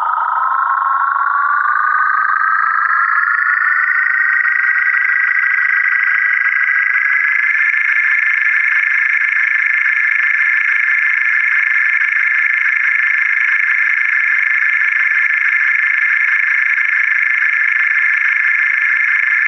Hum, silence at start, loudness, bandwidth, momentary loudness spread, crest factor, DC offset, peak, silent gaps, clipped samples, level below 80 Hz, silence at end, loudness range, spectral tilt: none; 0 s; -12 LUFS; 6.8 kHz; 2 LU; 12 dB; under 0.1%; -2 dBFS; none; under 0.1%; under -90 dBFS; 0 s; 1 LU; 7.5 dB/octave